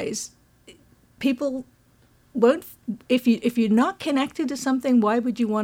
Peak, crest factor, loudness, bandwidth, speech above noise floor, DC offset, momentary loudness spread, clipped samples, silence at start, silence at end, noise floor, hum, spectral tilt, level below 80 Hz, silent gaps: -6 dBFS; 16 dB; -23 LUFS; 16.5 kHz; 36 dB; under 0.1%; 14 LU; under 0.1%; 0 s; 0 s; -58 dBFS; none; -5 dB/octave; -64 dBFS; none